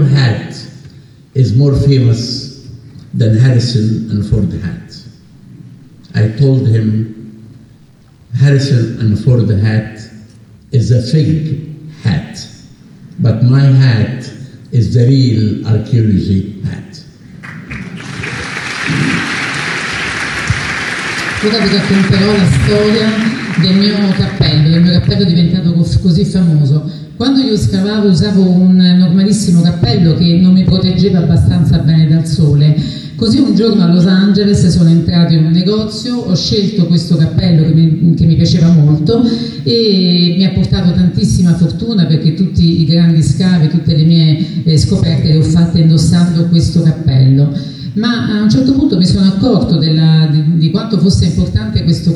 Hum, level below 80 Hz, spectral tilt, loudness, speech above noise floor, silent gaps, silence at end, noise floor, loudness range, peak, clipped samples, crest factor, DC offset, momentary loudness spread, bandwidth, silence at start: none; -32 dBFS; -7 dB/octave; -11 LUFS; 33 dB; none; 0 s; -42 dBFS; 6 LU; 0 dBFS; under 0.1%; 10 dB; under 0.1%; 10 LU; 11 kHz; 0 s